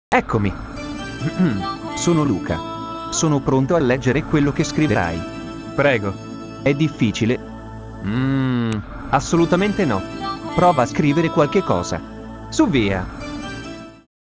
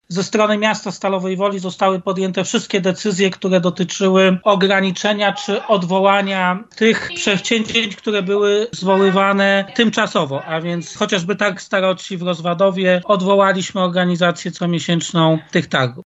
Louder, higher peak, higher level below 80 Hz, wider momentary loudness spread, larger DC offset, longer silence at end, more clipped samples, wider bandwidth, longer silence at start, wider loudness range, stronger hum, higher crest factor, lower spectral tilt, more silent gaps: second, -20 LUFS vs -17 LUFS; about the same, -2 dBFS vs -2 dBFS; first, -40 dBFS vs -60 dBFS; first, 13 LU vs 7 LU; neither; first, 0.35 s vs 0.15 s; neither; about the same, 8 kHz vs 8.2 kHz; about the same, 0.1 s vs 0.1 s; about the same, 3 LU vs 3 LU; neither; about the same, 18 dB vs 16 dB; about the same, -6 dB/octave vs -5 dB/octave; neither